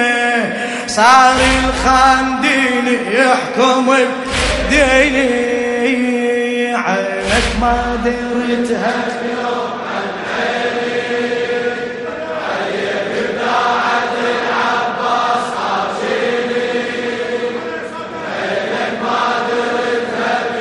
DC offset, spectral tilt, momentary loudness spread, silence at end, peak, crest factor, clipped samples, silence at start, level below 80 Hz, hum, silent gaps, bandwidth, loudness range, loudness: under 0.1%; -3.5 dB/octave; 9 LU; 0 s; 0 dBFS; 16 dB; under 0.1%; 0 s; -34 dBFS; none; none; 11.5 kHz; 7 LU; -15 LUFS